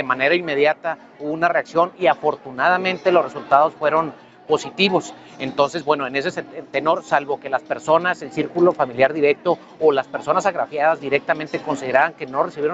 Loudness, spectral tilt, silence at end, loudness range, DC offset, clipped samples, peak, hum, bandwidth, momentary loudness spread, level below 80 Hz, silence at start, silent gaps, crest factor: -20 LUFS; -5 dB/octave; 0 s; 2 LU; under 0.1%; under 0.1%; 0 dBFS; none; 8.2 kHz; 7 LU; -64 dBFS; 0 s; none; 18 dB